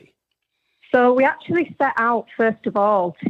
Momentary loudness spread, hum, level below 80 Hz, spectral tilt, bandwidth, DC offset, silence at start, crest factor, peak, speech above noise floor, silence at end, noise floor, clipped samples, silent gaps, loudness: 5 LU; none; -72 dBFS; -8 dB/octave; 6 kHz; under 0.1%; 0.95 s; 16 dB; -4 dBFS; 57 dB; 0 s; -76 dBFS; under 0.1%; none; -19 LUFS